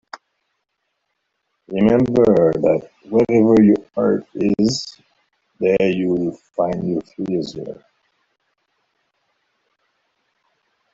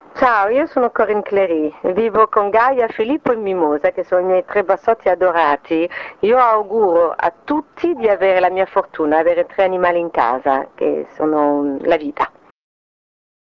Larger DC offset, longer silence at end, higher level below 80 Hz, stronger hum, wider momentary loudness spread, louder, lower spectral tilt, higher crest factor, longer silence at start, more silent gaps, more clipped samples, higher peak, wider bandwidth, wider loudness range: neither; first, 3.2 s vs 1.15 s; about the same, -52 dBFS vs -54 dBFS; neither; first, 15 LU vs 6 LU; about the same, -18 LUFS vs -16 LUFS; about the same, -7 dB/octave vs -7.5 dB/octave; about the same, 18 dB vs 16 dB; first, 1.7 s vs 0.15 s; neither; neither; about the same, -2 dBFS vs 0 dBFS; first, 7.8 kHz vs 6.4 kHz; first, 12 LU vs 2 LU